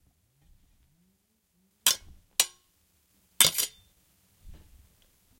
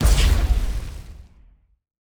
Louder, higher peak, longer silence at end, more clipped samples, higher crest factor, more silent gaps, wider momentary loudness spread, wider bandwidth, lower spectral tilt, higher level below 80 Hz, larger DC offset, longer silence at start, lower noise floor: second, -25 LUFS vs -22 LUFS; first, 0 dBFS vs -6 dBFS; about the same, 0.85 s vs 0.9 s; neither; first, 34 dB vs 16 dB; neither; second, 10 LU vs 22 LU; second, 16.5 kHz vs over 20 kHz; second, 1 dB/octave vs -4.5 dB/octave; second, -60 dBFS vs -22 dBFS; neither; first, 1.85 s vs 0 s; first, -72 dBFS vs -53 dBFS